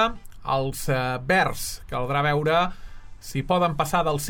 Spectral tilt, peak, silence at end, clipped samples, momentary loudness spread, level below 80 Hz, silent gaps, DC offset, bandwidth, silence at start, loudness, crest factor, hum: -4.5 dB/octave; -8 dBFS; 0 s; under 0.1%; 10 LU; -42 dBFS; none; under 0.1%; 19 kHz; 0 s; -24 LUFS; 16 dB; none